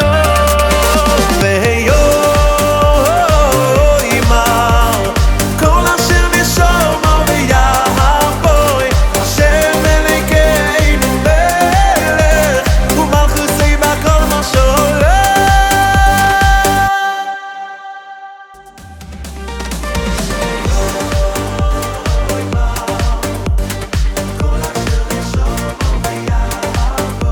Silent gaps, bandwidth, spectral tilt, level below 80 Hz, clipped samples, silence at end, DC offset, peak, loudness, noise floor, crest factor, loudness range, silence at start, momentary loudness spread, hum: none; over 20 kHz; -4.5 dB/octave; -16 dBFS; under 0.1%; 0 s; under 0.1%; 0 dBFS; -12 LUFS; -35 dBFS; 12 dB; 7 LU; 0 s; 8 LU; none